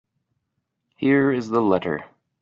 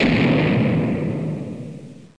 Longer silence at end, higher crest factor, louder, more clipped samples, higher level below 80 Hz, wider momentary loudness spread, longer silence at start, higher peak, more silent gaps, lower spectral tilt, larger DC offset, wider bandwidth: first, 0.35 s vs 0.15 s; about the same, 18 dB vs 14 dB; about the same, -21 LUFS vs -20 LUFS; neither; second, -64 dBFS vs -44 dBFS; second, 9 LU vs 17 LU; first, 1 s vs 0 s; about the same, -4 dBFS vs -6 dBFS; neither; second, -6 dB/octave vs -8 dB/octave; second, under 0.1% vs 0.2%; second, 7.2 kHz vs 9.8 kHz